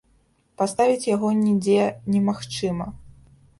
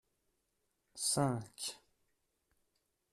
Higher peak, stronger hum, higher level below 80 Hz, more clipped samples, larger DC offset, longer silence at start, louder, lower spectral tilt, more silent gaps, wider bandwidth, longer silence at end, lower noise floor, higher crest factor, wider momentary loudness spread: first, -8 dBFS vs -22 dBFS; neither; first, -54 dBFS vs -76 dBFS; neither; neither; second, 0.6 s vs 0.95 s; first, -22 LUFS vs -37 LUFS; first, -6 dB/octave vs -4 dB/octave; neither; second, 11.5 kHz vs 14 kHz; second, 0.5 s vs 1.35 s; second, -62 dBFS vs -83 dBFS; about the same, 16 dB vs 20 dB; second, 8 LU vs 22 LU